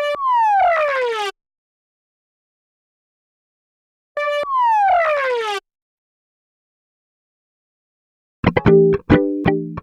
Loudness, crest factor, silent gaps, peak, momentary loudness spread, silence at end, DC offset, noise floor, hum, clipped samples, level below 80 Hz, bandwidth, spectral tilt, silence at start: -17 LUFS; 20 dB; 1.58-4.15 s, 5.82-8.43 s; 0 dBFS; 11 LU; 0 s; under 0.1%; under -90 dBFS; none; under 0.1%; -44 dBFS; 11 kHz; -7 dB/octave; 0 s